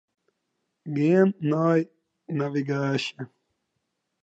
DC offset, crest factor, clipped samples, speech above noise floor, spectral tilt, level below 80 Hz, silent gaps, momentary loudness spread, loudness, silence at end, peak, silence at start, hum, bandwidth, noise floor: under 0.1%; 18 dB; under 0.1%; 55 dB; -7.5 dB/octave; -78 dBFS; none; 18 LU; -25 LUFS; 1 s; -10 dBFS; 0.85 s; none; 8 kHz; -79 dBFS